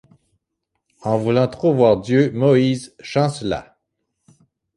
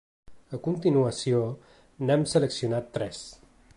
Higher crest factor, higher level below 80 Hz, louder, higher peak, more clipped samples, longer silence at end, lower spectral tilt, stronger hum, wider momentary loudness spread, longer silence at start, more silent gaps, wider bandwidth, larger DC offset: about the same, 18 dB vs 16 dB; first, -52 dBFS vs -60 dBFS; first, -18 LUFS vs -27 LUFS; first, -2 dBFS vs -10 dBFS; neither; first, 1.15 s vs 0.4 s; about the same, -7 dB/octave vs -6 dB/octave; neither; second, 11 LU vs 17 LU; first, 1.05 s vs 0.3 s; neither; about the same, 11.5 kHz vs 11.5 kHz; neither